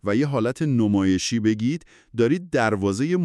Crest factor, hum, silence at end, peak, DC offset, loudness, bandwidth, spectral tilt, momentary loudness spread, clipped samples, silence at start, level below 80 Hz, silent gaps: 14 dB; none; 0 s; -6 dBFS; under 0.1%; -22 LUFS; 12 kHz; -6 dB/octave; 5 LU; under 0.1%; 0.05 s; -58 dBFS; none